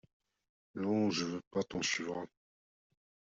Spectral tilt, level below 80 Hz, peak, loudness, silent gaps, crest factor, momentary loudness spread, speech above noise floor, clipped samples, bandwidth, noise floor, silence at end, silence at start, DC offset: -4 dB/octave; -72 dBFS; -22 dBFS; -36 LUFS; 1.47-1.51 s; 18 dB; 13 LU; over 54 dB; under 0.1%; 7.8 kHz; under -90 dBFS; 1.1 s; 0.75 s; under 0.1%